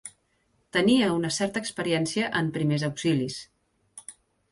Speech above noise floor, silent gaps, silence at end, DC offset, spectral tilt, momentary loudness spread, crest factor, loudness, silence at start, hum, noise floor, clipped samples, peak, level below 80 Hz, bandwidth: 44 dB; none; 0.4 s; under 0.1%; -5 dB/octave; 22 LU; 16 dB; -26 LUFS; 0.05 s; none; -70 dBFS; under 0.1%; -10 dBFS; -62 dBFS; 11.5 kHz